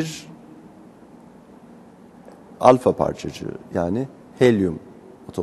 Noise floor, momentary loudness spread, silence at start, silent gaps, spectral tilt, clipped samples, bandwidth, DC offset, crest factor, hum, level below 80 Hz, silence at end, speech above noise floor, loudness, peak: -46 dBFS; 20 LU; 0 s; none; -6.5 dB/octave; under 0.1%; 12.5 kHz; under 0.1%; 24 dB; none; -54 dBFS; 0 s; 26 dB; -21 LUFS; 0 dBFS